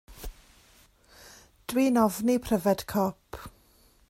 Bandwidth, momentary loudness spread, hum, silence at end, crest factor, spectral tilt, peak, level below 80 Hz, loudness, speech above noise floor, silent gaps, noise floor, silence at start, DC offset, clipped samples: 16 kHz; 22 LU; none; 0.6 s; 18 dB; -5.5 dB/octave; -10 dBFS; -52 dBFS; -26 LUFS; 36 dB; none; -61 dBFS; 0.1 s; under 0.1%; under 0.1%